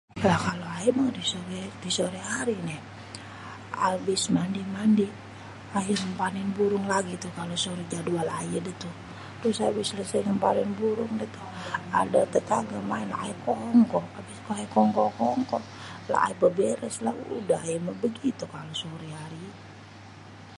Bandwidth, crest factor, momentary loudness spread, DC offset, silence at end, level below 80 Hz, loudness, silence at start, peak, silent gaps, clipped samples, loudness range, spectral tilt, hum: 11.5 kHz; 20 dB; 17 LU; under 0.1%; 0 s; -60 dBFS; -28 LUFS; 0.15 s; -8 dBFS; none; under 0.1%; 4 LU; -5 dB/octave; none